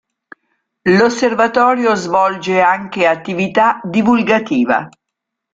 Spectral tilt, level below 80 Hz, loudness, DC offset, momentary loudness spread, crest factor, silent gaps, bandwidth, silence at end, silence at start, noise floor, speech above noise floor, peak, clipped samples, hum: -5.5 dB/octave; -56 dBFS; -14 LUFS; under 0.1%; 5 LU; 14 dB; none; 7.8 kHz; 0.65 s; 0.85 s; -78 dBFS; 65 dB; 0 dBFS; under 0.1%; none